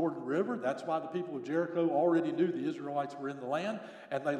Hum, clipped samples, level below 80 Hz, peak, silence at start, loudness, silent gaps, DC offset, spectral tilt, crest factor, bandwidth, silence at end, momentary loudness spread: none; under 0.1%; under -90 dBFS; -18 dBFS; 0 s; -34 LUFS; none; under 0.1%; -7 dB/octave; 14 dB; 9.6 kHz; 0 s; 9 LU